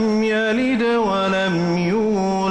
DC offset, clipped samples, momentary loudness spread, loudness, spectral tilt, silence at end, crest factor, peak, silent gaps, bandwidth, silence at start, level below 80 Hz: under 0.1%; under 0.1%; 1 LU; -19 LUFS; -6 dB/octave; 0 s; 8 dB; -10 dBFS; none; 10.5 kHz; 0 s; -50 dBFS